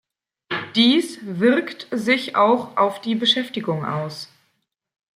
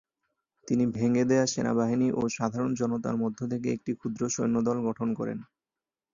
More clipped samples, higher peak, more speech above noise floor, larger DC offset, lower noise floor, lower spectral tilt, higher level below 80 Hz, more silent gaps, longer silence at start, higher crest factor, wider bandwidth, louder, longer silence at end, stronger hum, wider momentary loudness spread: neither; first, -4 dBFS vs -10 dBFS; second, 52 dB vs over 62 dB; neither; second, -72 dBFS vs under -90 dBFS; about the same, -5 dB/octave vs -6 dB/octave; second, -70 dBFS vs -64 dBFS; neither; second, 0.5 s vs 0.65 s; about the same, 18 dB vs 18 dB; first, 14 kHz vs 7.4 kHz; first, -20 LUFS vs -28 LUFS; first, 0.9 s vs 0.7 s; neither; first, 12 LU vs 7 LU